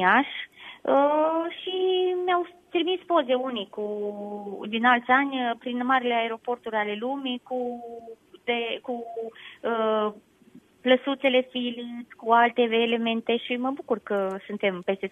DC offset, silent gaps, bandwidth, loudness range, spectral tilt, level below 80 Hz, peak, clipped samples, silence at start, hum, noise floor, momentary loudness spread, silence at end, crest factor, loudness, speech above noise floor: under 0.1%; none; 8.4 kHz; 6 LU; -6 dB/octave; -76 dBFS; -6 dBFS; under 0.1%; 0 s; none; -54 dBFS; 13 LU; 0 s; 20 dB; -26 LUFS; 29 dB